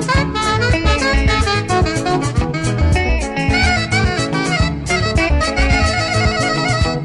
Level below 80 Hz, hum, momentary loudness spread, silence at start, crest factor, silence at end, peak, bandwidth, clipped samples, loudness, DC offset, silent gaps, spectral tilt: -22 dBFS; none; 3 LU; 0 s; 10 dB; 0 s; -6 dBFS; 11.5 kHz; under 0.1%; -16 LUFS; under 0.1%; none; -5 dB/octave